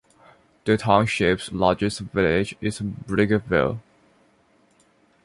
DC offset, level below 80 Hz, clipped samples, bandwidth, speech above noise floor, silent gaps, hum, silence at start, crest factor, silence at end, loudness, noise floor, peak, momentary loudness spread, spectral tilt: under 0.1%; -46 dBFS; under 0.1%; 11.5 kHz; 39 dB; none; none; 0.65 s; 22 dB; 1.45 s; -22 LUFS; -61 dBFS; -2 dBFS; 9 LU; -6 dB/octave